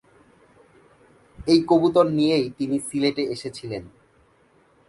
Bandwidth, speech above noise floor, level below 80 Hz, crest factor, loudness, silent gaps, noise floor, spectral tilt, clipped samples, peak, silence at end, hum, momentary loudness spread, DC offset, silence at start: 11.5 kHz; 38 dB; -56 dBFS; 20 dB; -22 LUFS; none; -59 dBFS; -5.5 dB/octave; under 0.1%; -4 dBFS; 1 s; none; 15 LU; under 0.1%; 1.4 s